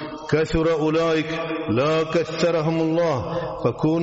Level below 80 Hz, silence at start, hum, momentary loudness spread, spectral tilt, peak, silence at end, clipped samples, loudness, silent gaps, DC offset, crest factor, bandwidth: -42 dBFS; 0 s; none; 5 LU; -5.5 dB/octave; -8 dBFS; 0 s; under 0.1%; -22 LUFS; none; under 0.1%; 14 dB; 8 kHz